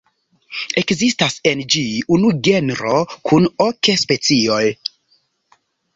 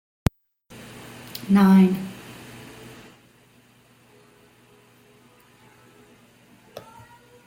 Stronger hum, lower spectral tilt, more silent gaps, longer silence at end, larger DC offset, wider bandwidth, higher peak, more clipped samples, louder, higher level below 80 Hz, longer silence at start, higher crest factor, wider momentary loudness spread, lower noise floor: neither; second, -4 dB/octave vs -7.5 dB/octave; neither; first, 1.2 s vs 0.7 s; neither; second, 8 kHz vs 16.5 kHz; about the same, 0 dBFS vs -2 dBFS; neither; first, -16 LUFS vs -20 LUFS; about the same, -54 dBFS vs -50 dBFS; second, 0.5 s vs 1.4 s; second, 16 dB vs 24 dB; second, 6 LU vs 29 LU; first, -62 dBFS vs -56 dBFS